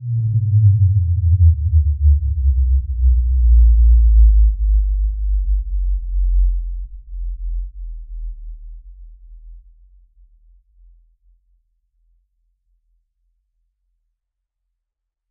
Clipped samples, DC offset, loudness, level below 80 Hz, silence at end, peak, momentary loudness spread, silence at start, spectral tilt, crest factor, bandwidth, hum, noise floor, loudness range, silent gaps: under 0.1%; under 0.1%; -17 LUFS; -18 dBFS; 5.7 s; -4 dBFS; 20 LU; 0 s; -26 dB/octave; 14 dB; 0.3 kHz; none; -80 dBFS; 19 LU; none